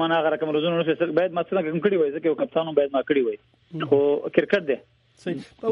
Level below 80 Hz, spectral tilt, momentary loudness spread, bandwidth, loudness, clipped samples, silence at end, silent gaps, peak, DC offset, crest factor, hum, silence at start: -68 dBFS; -7.5 dB/octave; 11 LU; 6.4 kHz; -23 LUFS; under 0.1%; 0 s; none; -4 dBFS; under 0.1%; 20 dB; none; 0 s